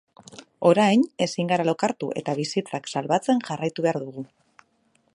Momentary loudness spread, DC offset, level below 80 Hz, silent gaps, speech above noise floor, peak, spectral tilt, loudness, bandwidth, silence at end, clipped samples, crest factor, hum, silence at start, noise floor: 11 LU; under 0.1%; -72 dBFS; none; 43 dB; -4 dBFS; -5.5 dB/octave; -24 LUFS; 11.5 kHz; 0.9 s; under 0.1%; 20 dB; none; 0.35 s; -66 dBFS